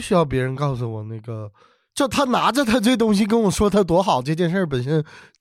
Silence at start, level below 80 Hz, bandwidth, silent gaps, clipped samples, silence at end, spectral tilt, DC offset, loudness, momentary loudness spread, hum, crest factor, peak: 0 s; -44 dBFS; 16 kHz; none; under 0.1%; 0.2 s; -5.5 dB/octave; under 0.1%; -20 LUFS; 14 LU; none; 14 dB; -6 dBFS